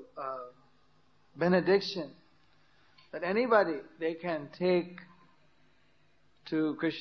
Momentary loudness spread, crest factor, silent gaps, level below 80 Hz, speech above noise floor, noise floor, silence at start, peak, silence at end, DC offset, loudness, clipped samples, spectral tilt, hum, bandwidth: 19 LU; 22 dB; none; -76 dBFS; 39 dB; -70 dBFS; 0 s; -12 dBFS; 0 s; under 0.1%; -31 LUFS; under 0.1%; -7 dB/octave; none; 6.4 kHz